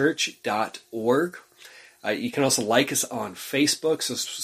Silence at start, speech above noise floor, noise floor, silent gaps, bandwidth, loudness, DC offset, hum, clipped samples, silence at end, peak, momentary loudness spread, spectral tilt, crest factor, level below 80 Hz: 0 s; 25 dB; -49 dBFS; none; 15.5 kHz; -25 LUFS; under 0.1%; none; under 0.1%; 0 s; -4 dBFS; 10 LU; -3 dB/octave; 20 dB; -68 dBFS